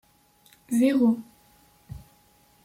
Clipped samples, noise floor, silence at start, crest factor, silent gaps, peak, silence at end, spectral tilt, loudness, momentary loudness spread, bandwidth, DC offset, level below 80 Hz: under 0.1%; -60 dBFS; 0.7 s; 16 dB; none; -12 dBFS; 0.7 s; -6 dB/octave; -24 LUFS; 25 LU; 15.5 kHz; under 0.1%; -58 dBFS